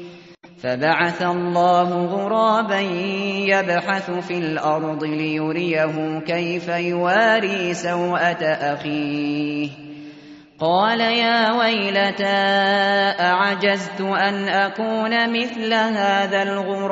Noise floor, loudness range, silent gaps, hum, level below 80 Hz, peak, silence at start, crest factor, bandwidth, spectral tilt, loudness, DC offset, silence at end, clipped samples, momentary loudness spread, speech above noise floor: -44 dBFS; 4 LU; none; none; -66 dBFS; -4 dBFS; 0 s; 16 dB; 8 kHz; -2.5 dB/octave; -20 LUFS; under 0.1%; 0 s; under 0.1%; 7 LU; 24 dB